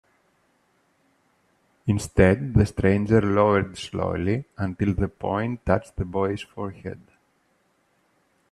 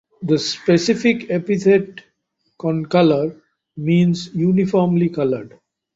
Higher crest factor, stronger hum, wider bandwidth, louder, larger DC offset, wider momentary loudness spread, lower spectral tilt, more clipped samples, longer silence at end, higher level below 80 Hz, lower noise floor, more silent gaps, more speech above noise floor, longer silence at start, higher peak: first, 22 dB vs 16 dB; neither; first, 12 kHz vs 7.8 kHz; second, -24 LUFS vs -18 LUFS; neither; first, 14 LU vs 9 LU; about the same, -7.5 dB/octave vs -6.5 dB/octave; neither; first, 1.55 s vs 0.5 s; first, -42 dBFS vs -58 dBFS; about the same, -67 dBFS vs -69 dBFS; neither; second, 44 dB vs 52 dB; first, 1.85 s vs 0.2 s; about the same, -4 dBFS vs -2 dBFS